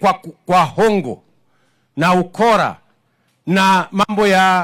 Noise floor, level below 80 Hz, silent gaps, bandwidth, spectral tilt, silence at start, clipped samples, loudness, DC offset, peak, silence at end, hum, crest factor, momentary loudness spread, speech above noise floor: -62 dBFS; -52 dBFS; none; 16.5 kHz; -5 dB/octave; 0 s; under 0.1%; -15 LUFS; under 0.1%; -2 dBFS; 0 s; none; 14 dB; 15 LU; 48 dB